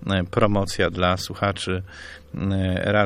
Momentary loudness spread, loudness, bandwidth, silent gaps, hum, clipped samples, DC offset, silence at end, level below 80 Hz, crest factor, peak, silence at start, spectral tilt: 12 LU; -23 LUFS; 15.5 kHz; none; none; under 0.1%; under 0.1%; 0 s; -42 dBFS; 20 dB; -4 dBFS; 0 s; -5.5 dB/octave